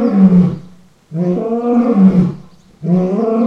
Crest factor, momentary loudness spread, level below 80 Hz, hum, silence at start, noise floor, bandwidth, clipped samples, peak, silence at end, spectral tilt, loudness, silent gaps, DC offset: 12 dB; 16 LU; -46 dBFS; none; 0 s; -41 dBFS; 5.2 kHz; under 0.1%; 0 dBFS; 0 s; -11 dB/octave; -13 LUFS; none; under 0.1%